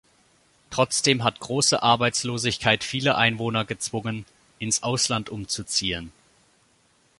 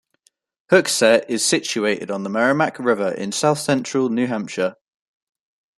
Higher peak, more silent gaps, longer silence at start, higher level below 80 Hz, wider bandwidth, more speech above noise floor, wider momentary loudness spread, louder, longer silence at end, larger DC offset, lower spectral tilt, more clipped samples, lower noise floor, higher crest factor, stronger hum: about the same, -2 dBFS vs -2 dBFS; neither; about the same, 0.7 s vs 0.7 s; first, -54 dBFS vs -66 dBFS; second, 11.5 kHz vs 13.5 kHz; second, 39 dB vs 45 dB; first, 11 LU vs 8 LU; second, -23 LUFS vs -19 LUFS; about the same, 1.1 s vs 1.05 s; neither; about the same, -3 dB/octave vs -3.5 dB/octave; neither; about the same, -63 dBFS vs -64 dBFS; about the same, 22 dB vs 18 dB; neither